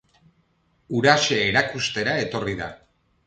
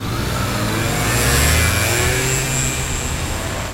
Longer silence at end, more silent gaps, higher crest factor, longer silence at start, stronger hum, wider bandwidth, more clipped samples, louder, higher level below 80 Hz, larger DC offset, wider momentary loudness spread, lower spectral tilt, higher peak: first, 0.5 s vs 0 s; neither; first, 22 dB vs 16 dB; first, 0.9 s vs 0 s; neither; second, 9.2 kHz vs 16 kHz; neither; second, -21 LUFS vs -17 LUFS; second, -54 dBFS vs -26 dBFS; neither; first, 11 LU vs 8 LU; about the same, -3.5 dB/octave vs -3.5 dB/octave; about the same, -2 dBFS vs -2 dBFS